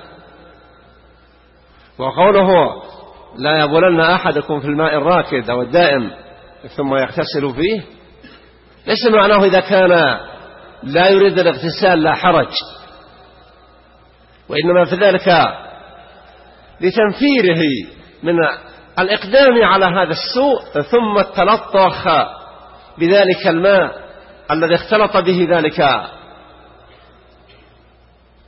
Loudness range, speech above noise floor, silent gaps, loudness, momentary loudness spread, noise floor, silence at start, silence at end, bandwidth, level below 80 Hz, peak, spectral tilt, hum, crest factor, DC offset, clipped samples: 5 LU; 36 dB; none; -14 LUFS; 13 LU; -49 dBFS; 2 s; 2.3 s; 6 kHz; -48 dBFS; -2 dBFS; -8.5 dB/octave; none; 14 dB; under 0.1%; under 0.1%